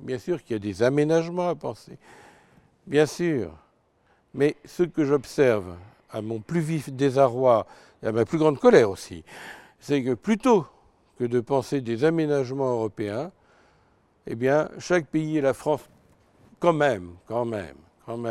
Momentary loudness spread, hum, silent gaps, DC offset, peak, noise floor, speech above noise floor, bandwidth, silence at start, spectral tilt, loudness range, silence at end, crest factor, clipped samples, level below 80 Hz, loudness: 17 LU; none; none; under 0.1%; -4 dBFS; -64 dBFS; 40 dB; 14 kHz; 0 s; -6.5 dB/octave; 5 LU; 0 s; 22 dB; under 0.1%; -62 dBFS; -24 LUFS